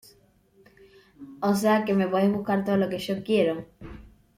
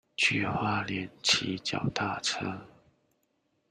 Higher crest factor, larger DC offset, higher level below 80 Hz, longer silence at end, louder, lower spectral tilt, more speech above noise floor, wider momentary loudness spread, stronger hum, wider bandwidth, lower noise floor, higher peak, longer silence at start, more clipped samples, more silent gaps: second, 16 dB vs 24 dB; neither; first, -56 dBFS vs -64 dBFS; second, 0.3 s vs 1.05 s; first, -25 LUFS vs -29 LUFS; first, -6.5 dB/octave vs -3 dB/octave; second, 36 dB vs 44 dB; first, 16 LU vs 9 LU; neither; first, 16 kHz vs 14 kHz; second, -60 dBFS vs -75 dBFS; about the same, -10 dBFS vs -10 dBFS; first, 1.2 s vs 0.2 s; neither; neither